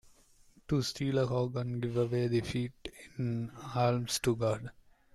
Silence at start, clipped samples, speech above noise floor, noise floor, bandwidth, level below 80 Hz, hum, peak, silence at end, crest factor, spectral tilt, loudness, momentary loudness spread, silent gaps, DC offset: 0.05 s; under 0.1%; 30 dB; -62 dBFS; 14 kHz; -58 dBFS; none; -16 dBFS; 0.45 s; 16 dB; -6 dB/octave; -33 LUFS; 9 LU; none; under 0.1%